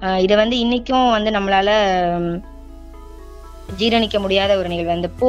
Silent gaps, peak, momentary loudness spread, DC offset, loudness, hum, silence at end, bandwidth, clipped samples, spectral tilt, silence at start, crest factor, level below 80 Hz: none; 0 dBFS; 7 LU; under 0.1%; -17 LUFS; none; 0 s; 12.5 kHz; under 0.1%; -5.5 dB/octave; 0 s; 18 dB; -38 dBFS